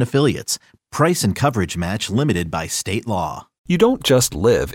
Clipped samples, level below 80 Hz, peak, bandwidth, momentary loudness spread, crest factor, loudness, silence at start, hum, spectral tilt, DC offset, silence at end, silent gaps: under 0.1%; -42 dBFS; -2 dBFS; 17 kHz; 9 LU; 16 dB; -19 LUFS; 0 s; none; -4.5 dB/octave; under 0.1%; 0 s; 3.58-3.64 s